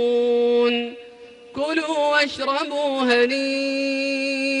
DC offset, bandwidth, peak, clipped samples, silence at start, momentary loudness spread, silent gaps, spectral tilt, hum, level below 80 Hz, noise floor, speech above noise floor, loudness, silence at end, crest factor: under 0.1%; 10.5 kHz; -8 dBFS; under 0.1%; 0 s; 7 LU; none; -2.5 dB/octave; none; -66 dBFS; -43 dBFS; 22 dB; -21 LUFS; 0 s; 14 dB